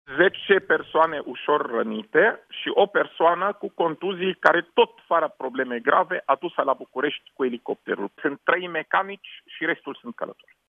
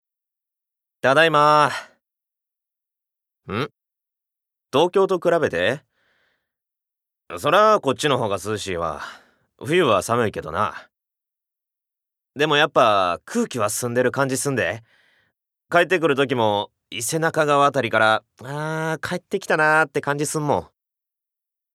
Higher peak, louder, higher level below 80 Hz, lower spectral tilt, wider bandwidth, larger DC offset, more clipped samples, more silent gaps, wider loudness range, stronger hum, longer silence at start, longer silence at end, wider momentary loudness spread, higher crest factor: about the same, 0 dBFS vs -2 dBFS; second, -23 LUFS vs -20 LUFS; second, -74 dBFS vs -64 dBFS; first, -6.5 dB/octave vs -4 dB/octave; second, 6.6 kHz vs 15.5 kHz; neither; neither; neither; about the same, 5 LU vs 4 LU; neither; second, 0.1 s vs 1.05 s; second, 0.35 s vs 1.1 s; about the same, 10 LU vs 12 LU; about the same, 24 dB vs 20 dB